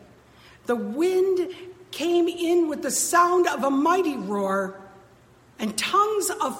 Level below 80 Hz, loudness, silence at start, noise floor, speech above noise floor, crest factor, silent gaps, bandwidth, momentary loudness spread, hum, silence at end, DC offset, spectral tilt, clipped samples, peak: -66 dBFS; -23 LUFS; 0.7 s; -54 dBFS; 31 dB; 18 dB; none; 16.5 kHz; 12 LU; none; 0 s; under 0.1%; -3.5 dB/octave; under 0.1%; -6 dBFS